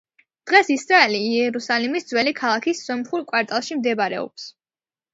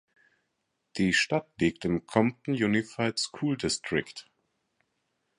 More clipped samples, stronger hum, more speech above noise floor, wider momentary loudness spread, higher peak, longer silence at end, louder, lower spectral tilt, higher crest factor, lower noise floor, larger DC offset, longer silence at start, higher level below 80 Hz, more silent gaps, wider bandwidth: neither; neither; first, over 69 dB vs 51 dB; first, 13 LU vs 6 LU; first, 0 dBFS vs -8 dBFS; second, 0.65 s vs 1.15 s; first, -20 LUFS vs -28 LUFS; second, -3 dB/octave vs -4.5 dB/octave; about the same, 20 dB vs 22 dB; first, under -90 dBFS vs -79 dBFS; neither; second, 0.45 s vs 0.95 s; second, -74 dBFS vs -58 dBFS; neither; second, 8 kHz vs 11 kHz